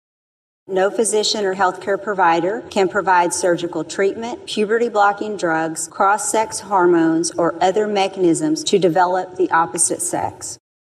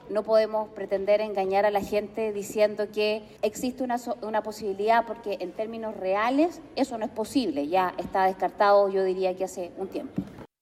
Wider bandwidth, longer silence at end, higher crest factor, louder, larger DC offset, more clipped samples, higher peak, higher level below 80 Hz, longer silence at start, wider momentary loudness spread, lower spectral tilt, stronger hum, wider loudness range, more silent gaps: about the same, 14 kHz vs 14 kHz; first, 0.3 s vs 0.15 s; about the same, 14 dB vs 16 dB; first, -18 LUFS vs -27 LUFS; neither; neither; first, -4 dBFS vs -10 dBFS; about the same, -64 dBFS vs -60 dBFS; first, 0.7 s vs 0 s; second, 7 LU vs 10 LU; second, -3.5 dB/octave vs -5 dB/octave; neither; about the same, 2 LU vs 3 LU; neither